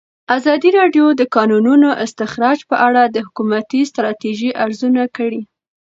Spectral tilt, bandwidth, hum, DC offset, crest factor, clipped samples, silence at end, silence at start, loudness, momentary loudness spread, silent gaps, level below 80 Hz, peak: -5.5 dB/octave; 7.8 kHz; none; under 0.1%; 14 dB; under 0.1%; 0.5 s; 0.3 s; -14 LUFS; 9 LU; none; -64 dBFS; 0 dBFS